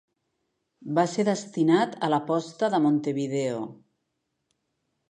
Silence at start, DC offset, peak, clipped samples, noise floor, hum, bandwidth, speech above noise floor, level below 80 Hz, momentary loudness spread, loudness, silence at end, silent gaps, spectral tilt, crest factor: 0.8 s; under 0.1%; -8 dBFS; under 0.1%; -79 dBFS; none; 10 kHz; 54 dB; -78 dBFS; 8 LU; -25 LUFS; 1.35 s; none; -6 dB/octave; 18 dB